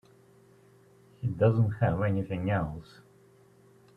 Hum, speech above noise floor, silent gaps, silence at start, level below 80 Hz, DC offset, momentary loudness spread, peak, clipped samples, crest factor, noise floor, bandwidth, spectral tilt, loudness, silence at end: none; 32 dB; none; 1.2 s; -56 dBFS; under 0.1%; 12 LU; -12 dBFS; under 0.1%; 20 dB; -59 dBFS; 4.8 kHz; -9.5 dB/octave; -29 LUFS; 1.15 s